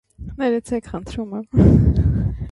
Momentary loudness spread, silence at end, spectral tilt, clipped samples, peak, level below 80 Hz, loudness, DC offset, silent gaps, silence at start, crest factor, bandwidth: 15 LU; 0 s; -9 dB/octave; under 0.1%; 0 dBFS; -26 dBFS; -19 LUFS; under 0.1%; none; 0.2 s; 18 dB; 11.5 kHz